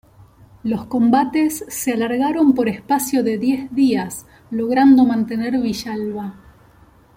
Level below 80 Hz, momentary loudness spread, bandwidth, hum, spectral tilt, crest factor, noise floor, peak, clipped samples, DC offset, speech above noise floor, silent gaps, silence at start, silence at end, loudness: -52 dBFS; 13 LU; 16.5 kHz; none; -5 dB/octave; 16 dB; -50 dBFS; -4 dBFS; under 0.1%; under 0.1%; 32 dB; none; 0.65 s; 0.85 s; -18 LUFS